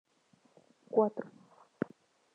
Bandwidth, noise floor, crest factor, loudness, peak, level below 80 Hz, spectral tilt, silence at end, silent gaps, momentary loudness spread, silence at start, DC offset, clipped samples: 6.8 kHz; -69 dBFS; 24 dB; -35 LUFS; -14 dBFS; -88 dBFS; -9 dB/octave; 1.05 s; none; 15 LU; 0.9 s; under 0.1%; under 0.1%